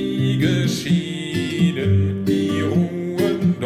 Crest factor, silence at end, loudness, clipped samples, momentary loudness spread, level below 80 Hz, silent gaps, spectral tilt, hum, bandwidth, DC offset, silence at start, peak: 12 dB; 0 s; -20 LUFS; under 0.1%; 4 LU; -52 dBFS; none; -6.5 dB/octave; none; 15 kHz; under 0.1%; 0 s; -6 dBFS